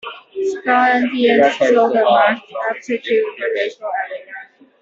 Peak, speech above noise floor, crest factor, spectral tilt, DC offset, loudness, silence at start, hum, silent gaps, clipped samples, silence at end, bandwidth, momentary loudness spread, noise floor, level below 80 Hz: 0 dBFS; 22 dB; 16 dB; -4.5 dB/octave; under 0.1%; -16 LUFS; 0.05 s; none; none; under 0.1%; 0.4 s; 7.8 kHz; 13 LU; -37 dBFS; -66 dBFS